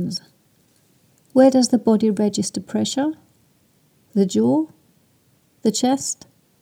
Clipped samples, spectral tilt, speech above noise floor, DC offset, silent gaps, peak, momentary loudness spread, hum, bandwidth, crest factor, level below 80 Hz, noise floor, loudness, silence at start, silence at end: under 0.1%; -5 dB/octave; 42 dB; under 0.1%; none; -4 dBFS; 13 LU; none; 15.5 kHz; 18 dB; -68 dBFS; -60 dBFS; -20 LUFS; 0 s; 0.5 s